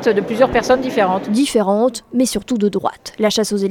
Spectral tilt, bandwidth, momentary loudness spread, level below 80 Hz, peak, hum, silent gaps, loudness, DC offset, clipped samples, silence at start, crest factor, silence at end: -4.5 dB/octave; 17.5 kHz; 4 LU; -46 dBFS; 0 dBFS; none; none; -17 LUFS; under 0.1%; under 0.1%; 0 s; 16 dB; 0 s